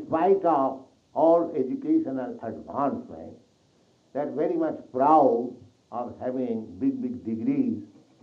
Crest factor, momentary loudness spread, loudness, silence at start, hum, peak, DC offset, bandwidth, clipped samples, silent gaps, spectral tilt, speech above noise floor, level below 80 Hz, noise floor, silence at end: 18 dB; 16 LU; -26 LUFS; 0 s; none; -8 dBFS; under 0.1%; 6.6 kHz; under 0.1%; none; -9.5 dB/octave; 38 dB; -70 dBFS; -63 dBFS; 0.35 s